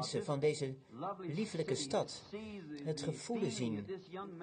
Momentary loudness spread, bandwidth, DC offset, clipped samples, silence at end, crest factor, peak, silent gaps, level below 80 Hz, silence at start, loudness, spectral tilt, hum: 11 LU; 9.6 kHz; under 0.1%; under 0.1%; 0 s; 16 dB; -24 dBFS; none; -72 dBFS; 0 s; -40 LUFS; -5 dB/octave; none